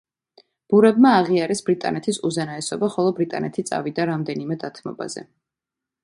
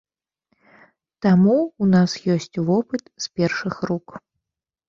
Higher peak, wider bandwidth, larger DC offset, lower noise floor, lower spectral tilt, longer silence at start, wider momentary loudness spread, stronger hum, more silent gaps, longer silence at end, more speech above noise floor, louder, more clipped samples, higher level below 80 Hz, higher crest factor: about the same, -4 dBFS vs -6 dBFS; first, 11.5 kHz vs 7.6 kHz; neither; about the same, -87 dBFS vs -85 dBFS; about the same, -5.5 dB/octave vs -6.5 dB/octave; second, 0.7 s vs 1.2 s; first, 16 LU vs 12 LU; neither; neither; about the same, 0.8 s vs 0.7 s; about the same, 66 dB vs 65 dB; about the same, -21 LUFS vs -21 LUFS; neither; second, -66 dBFS vs -58 dBFS; about the same, 18 dB vs 16 dB